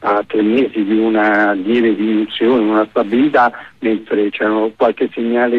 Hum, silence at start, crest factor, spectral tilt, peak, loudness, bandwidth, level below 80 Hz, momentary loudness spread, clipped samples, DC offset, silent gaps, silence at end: none; 0 s; 12 dB; -7.5 dB/octave; -4 dBFS; -15 LUFS; 5.4 kHz; -58 dBFS; 4 LU; under 0.1%; under 0.1%; none; 0 s